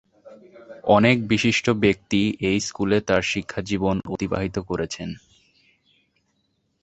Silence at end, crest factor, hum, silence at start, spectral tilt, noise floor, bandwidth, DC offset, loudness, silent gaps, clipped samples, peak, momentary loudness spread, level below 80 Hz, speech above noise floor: 1.65 s; 20 dB; none; 0.25 s; -5 dB/octave; -70 dBFS; 8.2 kHz; under 0.1%; -22 LUFS; none; under 0.1%; -2 dBFS; 11 LU; -48 dBFS; 49 dB